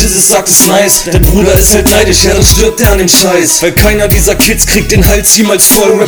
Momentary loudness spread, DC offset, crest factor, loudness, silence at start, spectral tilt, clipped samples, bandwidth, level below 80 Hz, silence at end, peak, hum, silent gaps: 4 LU; under 0.1%; 6 dB; -5 LUFS; 0 s; -3 dB/octave; 8%; over 20 kHz; -14 dBFS; 0 s; 0 dBFS; none; none